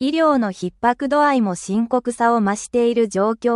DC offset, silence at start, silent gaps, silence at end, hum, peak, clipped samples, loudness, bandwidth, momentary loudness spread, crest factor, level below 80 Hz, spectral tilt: under 0.1%; 0 s; none; 0 s; none; -4 dBFS; under 0.1%; -19 LUFS; 11.5 kHz; 5 LU; 14 dB; -56 dBFS; -5.5 dB/octave